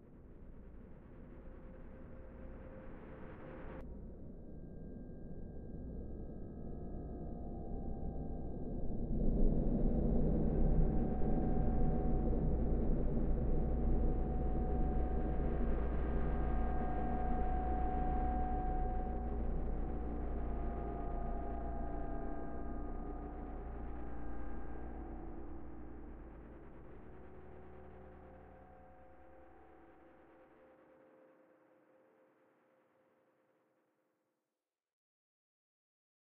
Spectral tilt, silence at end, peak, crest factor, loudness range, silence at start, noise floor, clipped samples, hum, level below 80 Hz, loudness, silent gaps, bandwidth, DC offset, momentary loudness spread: -10.5 dB/octave; 1.4 s; -20 dBFS; 18 dB; 18 LU; 0 s; under -90 dBFS; under 0.1%; none; -40 dBFS; -41 LUFS; none; 3 kHz; under 0.1%; 20 LU